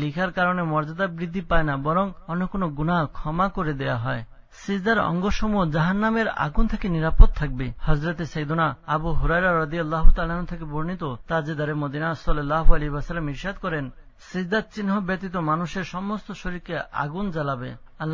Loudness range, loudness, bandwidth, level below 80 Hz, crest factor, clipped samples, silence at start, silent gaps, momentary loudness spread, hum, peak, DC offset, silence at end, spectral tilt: 4 LU; -25 LUFS; 7 kHz; -28 dBFS; 22 dB; under 0.1%; 0 s; none; 9 LU; none; 0 dBFS; under 0.1%; 0 s; -7.5 dB/octave